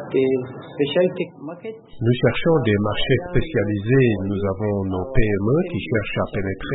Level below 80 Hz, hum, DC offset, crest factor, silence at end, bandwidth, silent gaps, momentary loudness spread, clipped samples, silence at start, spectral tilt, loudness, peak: -34 dBFS; none; under 0.1%; 18 dB; 0 s; 4.1 kHz; none; 10 LU; under 0.1%; 0 s; -12 dB/octave; -21 LUFS; -2 dBFS